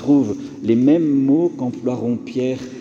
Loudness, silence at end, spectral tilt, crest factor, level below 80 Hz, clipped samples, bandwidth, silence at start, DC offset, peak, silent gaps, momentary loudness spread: -18 LUFS; 0 s; -8 dB/octave; 14 dB; -60 dBFS; under 0.1%; 7.2 kHz; 0 s; under 0.1%; -4 dBFS; none; 9 LU